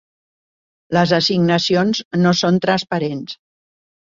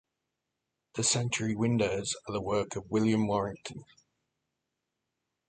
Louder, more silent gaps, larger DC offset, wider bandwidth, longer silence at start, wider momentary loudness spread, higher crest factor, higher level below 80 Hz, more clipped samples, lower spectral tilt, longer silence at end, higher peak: first, -17 LUFS vs -30 LUFS; first, 2.05-2.11 s vs none; neither; second, 7.6 kHz vs 9.6 kHz; about the same, 0.9 s vs 0.95 s; second, 11 LU vs 14 LU; about the same, 18 dB vs 18 dB; about the same, -56 dBFS vs -60 dBFS; neither; about the same, -5.5 dB/octave vs -4.5 dB/octave; second, 0.8 s vs 1.65 s; first, -2 dBFS vs -14 dBFS